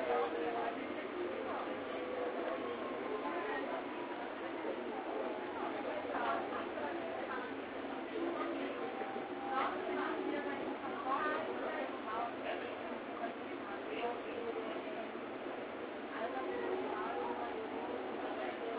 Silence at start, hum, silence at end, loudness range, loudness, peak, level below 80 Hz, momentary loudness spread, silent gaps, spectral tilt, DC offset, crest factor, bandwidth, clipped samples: 0 s; none; 0 s; 3 LU; -40 LUFS; -24 dBFS; -74 dBFS; 6 LU; none; -2 dB/octave; under 0.1%; 16 dB; 4 kHz; under 0.1%